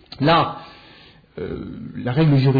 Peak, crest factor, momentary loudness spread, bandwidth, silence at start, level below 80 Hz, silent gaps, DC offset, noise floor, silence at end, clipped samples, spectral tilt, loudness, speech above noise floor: -6 dBFS; 14 dB; 21 LU; 5 kHz; 0.1 s; -48 dBFS; none; under 0.1%; -48 dBFS; 0 s; under 0.1%; -9.5 dB/octave; -20 LUFS; 29 dB